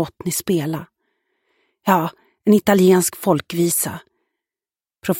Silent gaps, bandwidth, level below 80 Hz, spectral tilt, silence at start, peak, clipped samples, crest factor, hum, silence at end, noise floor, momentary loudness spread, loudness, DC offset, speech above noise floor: none; 17 kHz; -58 dBFS; -5 dB/octave; 0 s; -2 dBFS; under 0.1%; 18 dB; none; 0 s; under -90 dBFS; 14 LU; -18 LUFS; under 0.1%; over 73 dB